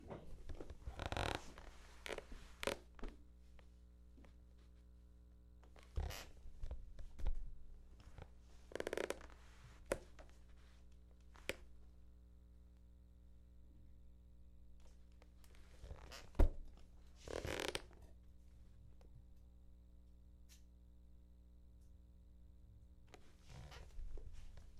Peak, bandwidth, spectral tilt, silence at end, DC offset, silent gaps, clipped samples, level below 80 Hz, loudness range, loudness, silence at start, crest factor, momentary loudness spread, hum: -20 dBFS; 14 kHz; -4.5 dB/octave; 0 s; under 0.1%; none; under 0.1%; -50 dBFS; 19 LU; -49 LUFS; 0 s; 30 dB; 21 LU; 60 Hz at -65 dBFS